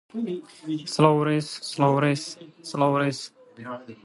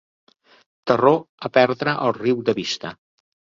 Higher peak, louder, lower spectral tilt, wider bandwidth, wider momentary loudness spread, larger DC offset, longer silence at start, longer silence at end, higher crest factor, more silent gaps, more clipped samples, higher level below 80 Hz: about the same, -4 dBFS vs -2 dBFS; second, -24 LUFS vs -20 LUFS; about the same, -6 dB/octave vs -5.5 dB/octave; first, 11.5 kHz vs 7.6 kHz; first, 18 LU vs 11 LU; neither; second, 0.15 s vs 0.85 s; second, 0.1 s vs 0.6 s; about the same, 22 dB vs 20 dB; second, none vs 1.29-1.38 s; neither; second, -68 dBFS vs -62 dBFS